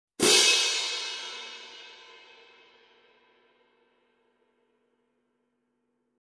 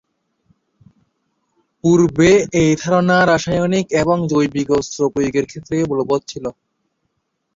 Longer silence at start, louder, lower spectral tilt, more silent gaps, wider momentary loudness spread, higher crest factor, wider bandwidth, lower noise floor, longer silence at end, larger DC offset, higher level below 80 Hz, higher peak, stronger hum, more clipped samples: second, 0.2 s vs 1.85 s; second, -22 LUFS vs -16 LUFS; second, 0 dB/octave vs -5.5 dB/octave; neither; first, 27 LU vs 9 LU; first, 26 dB vs 16 dB; first, 11 kHz vs 7.8 kHz; first, -76 dBFS vs -71 dBFS; first, 4.3 s vs 1.05 s; neither; second, -74 dBFS vs -46 dBFS; second, -6 dBFS vs -2 dBFS; neither; neither